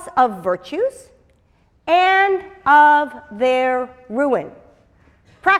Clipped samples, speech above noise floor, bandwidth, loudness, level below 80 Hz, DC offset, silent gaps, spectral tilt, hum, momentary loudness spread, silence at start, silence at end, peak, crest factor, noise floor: under 0.1%; 41 dB; 12.5 kHz; -17 LUFS; -58 dBFS; under 0.1%; none; -4.5 dB/octave; none; 13 LU; 0 s; 0 s; -2 dBFS; 16 dB; -58 dBFS